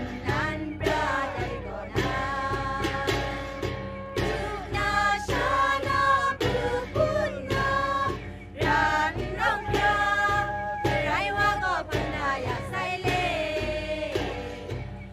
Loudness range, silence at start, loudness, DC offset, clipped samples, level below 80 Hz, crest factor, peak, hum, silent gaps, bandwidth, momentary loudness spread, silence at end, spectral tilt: 4 LU; 0 s; -27 LUFS; under 0.1%; under 0.1%; -42 dBFS; 16 dB; -12 dBFS; none; none; 15.5 kHz; 9 LU; 0 s; -5 dB/octave